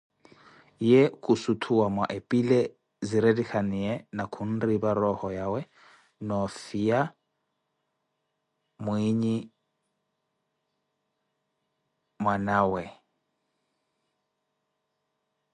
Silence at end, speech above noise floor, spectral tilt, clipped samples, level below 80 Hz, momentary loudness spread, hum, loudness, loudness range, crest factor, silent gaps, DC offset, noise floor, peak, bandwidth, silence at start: 2.6 s; 54 dB; -7 dB/octave; under 0.1%; -60 dBFS; 10 LU; none; -27 LUFS; 9 LU; 20 dB; none; under 0.1%; -80 dBFS; -8 dBFS; 11 kHz; 0.8 s